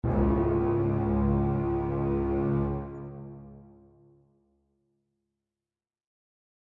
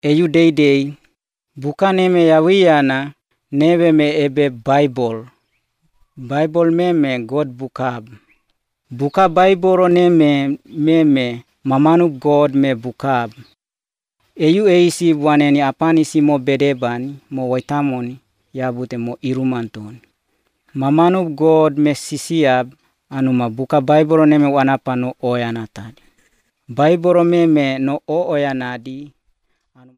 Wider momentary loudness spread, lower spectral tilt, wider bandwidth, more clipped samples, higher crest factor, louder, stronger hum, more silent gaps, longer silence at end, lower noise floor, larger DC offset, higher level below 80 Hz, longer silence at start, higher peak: about the same, 16 LU vs 14 LU; first, -12.5 dB/octave vs -6.5 dB/octave; second, 3.8 kHz vs 12.5 kHz; neither; about the same, 16 dB vs 14 dB; second, -28 LUFS vs -15 LUFS; neither; neither; first, 2.9 s vs 0.9 s; about the same, under -90 dBFS vs under -90 dBFS; neither; first, -40 dBFS vs -60 dBFS; about the same, 0.05 s vs 0.05 s; second, -14 dBFS vs -2 dBFS